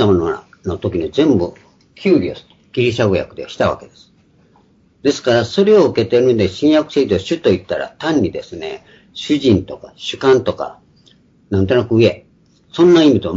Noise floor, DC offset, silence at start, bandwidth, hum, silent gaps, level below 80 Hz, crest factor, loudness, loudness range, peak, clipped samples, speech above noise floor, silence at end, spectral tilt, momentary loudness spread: -52 dBFS; under 0.1%; 0 s; 7.8 kHz; none; none; -48 dBFS; 16 dB; -15 LUFS; 5 LU; 0 dBFS; under 0.1%; 38 dB; 0 s; -6.5 dB/octave; 16 LU